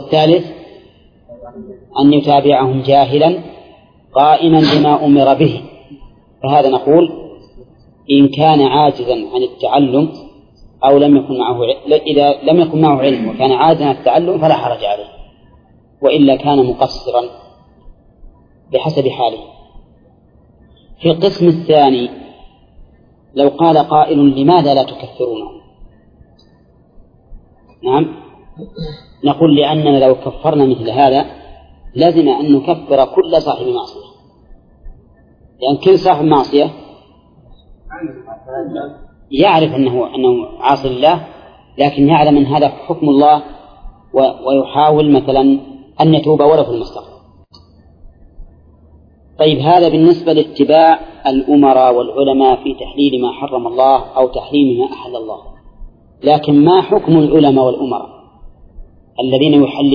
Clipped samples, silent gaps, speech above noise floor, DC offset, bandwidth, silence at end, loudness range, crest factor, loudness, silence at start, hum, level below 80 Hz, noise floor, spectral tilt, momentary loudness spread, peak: under 0.1%; none; 37 dB; under 0.1%; 5.2 kHz; 0 s; 6 LU; 12 dB; -12 LUFS; 0 s; none; -42 dBFS; -48 dBFS; -8.5 dB/octave; 14 LU; 0 dBFS